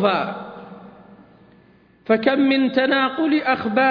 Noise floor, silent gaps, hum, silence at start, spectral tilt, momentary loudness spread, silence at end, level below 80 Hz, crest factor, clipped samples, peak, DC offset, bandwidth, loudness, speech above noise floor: -53 dBFS; none; none; 0 s; -7.5 dB/octave; 21 LU; 0 s; -64 dBFS; 18 dB; under 0.1%; -4 dBFS; under 0.1%; 5.2 kHz; -19 LUFS; 34 dB